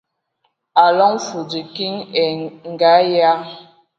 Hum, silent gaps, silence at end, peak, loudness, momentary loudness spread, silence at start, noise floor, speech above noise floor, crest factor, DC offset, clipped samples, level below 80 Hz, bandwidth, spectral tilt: none; none; 0.35 s; 0 dBFS; -16 LUFS; 14 LU; 0.75 s; -68 dBFS; 52 dB; 18 dB; under 0.1%; under 0.1%; -72 dBFS; 7.6 kHz; -4.5 dB/octave